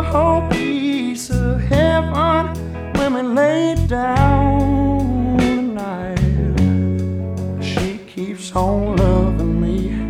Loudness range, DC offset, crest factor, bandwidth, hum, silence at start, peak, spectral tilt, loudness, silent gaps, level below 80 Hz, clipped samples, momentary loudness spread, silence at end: 3 LU; under 0.1%; 14 dB; 14.5 kHz; none; 0 s; -2 dBFS; -7 dB/octave; -18 LUFS; none; -26 dBFS; under 0.1%; 8 LU; 0 s